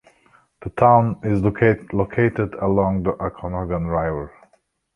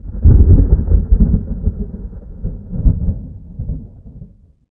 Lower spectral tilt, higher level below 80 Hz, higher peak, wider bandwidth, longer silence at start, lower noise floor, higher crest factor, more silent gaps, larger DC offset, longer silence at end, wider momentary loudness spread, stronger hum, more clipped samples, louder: second, -10 dB/octave vs -15.5 dB/octave; second, -40 dBFS vs -16 dBFS; about the same, -2 dBFS vs 0 dBFS; first, 5.2 kHz vs 1.7 kHz; first, 0.6 s vs 0.05 s; first, -63 dBFS vs -40 dBFS; about the same, 18 dB vs 14 dB; neither; neither; first, 0.65 s vs 0.5 s; second, 13 LU vs 20 LU; neither; neither; second, -20 LUFS vs -15 LUFS